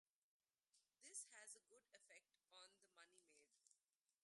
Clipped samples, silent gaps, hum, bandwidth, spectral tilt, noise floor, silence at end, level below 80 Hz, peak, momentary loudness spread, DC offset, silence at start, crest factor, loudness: under 0.1%; none; none; 11.5 kHz; 2 dB/octave; under -90 dBFS; 0.45 s; under -90 dBFS; -42 dBFS; 12 LU; under 0.1%; 0.75 s; 26 dB; -61 LUFS